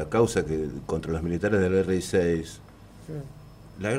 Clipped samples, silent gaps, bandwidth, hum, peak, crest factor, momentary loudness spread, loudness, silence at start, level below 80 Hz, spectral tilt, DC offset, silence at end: under 0.1%; none; 15.5 kHz; 50 Hz at -50 dBFS; -8 dBFS; 18 dB; 20 LU; -26 LUFS; 0 s; -48 dBFS; -6 dB/octave; under 0.1%; 0 s